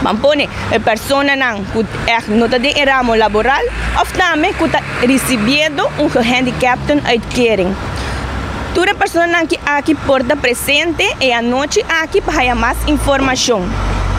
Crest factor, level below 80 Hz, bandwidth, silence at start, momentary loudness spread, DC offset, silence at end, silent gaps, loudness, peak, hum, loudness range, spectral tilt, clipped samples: 14 dB; -28 dBFS; 16 kHz; 0 s; 5 LU; under 0.1%; 0 s; none; -13 LUFS; 0 dBFS; none; 2 LU; -4 dB/octave; under 0.1%